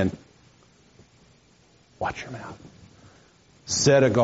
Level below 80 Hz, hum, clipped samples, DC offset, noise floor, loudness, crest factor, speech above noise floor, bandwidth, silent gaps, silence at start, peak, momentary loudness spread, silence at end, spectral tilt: -58 dBFS; none; under 0.1%; under 0.1%; -58 dBFS; -24 LUFS; 20 dB; 36 dB; 8 kHz; none; 0 s; -6 dBFS; 27 LU; 0 s; -5 dB/octave